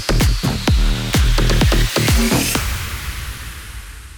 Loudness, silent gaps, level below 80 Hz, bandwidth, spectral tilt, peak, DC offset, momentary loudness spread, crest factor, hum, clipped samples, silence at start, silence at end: -17 LUFS; none; -20 dBFS; over 20 kHz; -4.5 dB/octave; -4 dBFS; under 0.1%; 15 LU; 12 dB; none; under 0.1%; 0 s; 0 s